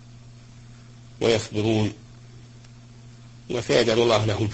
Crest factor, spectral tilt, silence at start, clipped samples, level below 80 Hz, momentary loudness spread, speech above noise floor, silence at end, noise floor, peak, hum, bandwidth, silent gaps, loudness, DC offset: 20 dB; -5.5 dB/octave; 0.05 s; under 0.1%; -52 dBFS; 11 LU; 24 dB; 0 s; -46 dBFS; -6 dBFS; none; 8.6 kHz; none; -23 LUFS; under 0.1%